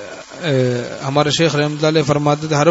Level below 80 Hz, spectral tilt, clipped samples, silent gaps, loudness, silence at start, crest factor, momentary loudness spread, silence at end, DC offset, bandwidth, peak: -52 dBFS; -5 dB/octave; under 0.1%; none; -17 LUFS; 0 s; 16 dB; 7 LU; 0 s; under 0.1%; 8 kHz; 0 dBFS